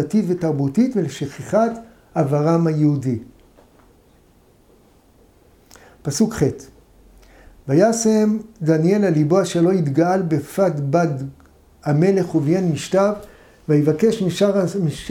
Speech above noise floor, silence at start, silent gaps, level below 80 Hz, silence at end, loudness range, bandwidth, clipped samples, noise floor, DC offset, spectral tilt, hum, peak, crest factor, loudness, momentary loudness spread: 36 dB; 0 s; none; -52 dBFS; 0 s; 9 LU; 15.5 kHz; under 0.1%; -53 dBFS; under 0.1%; -7 dB/octave; none; -4 dBFS; 16 dB; -19 LUFS; 11 LU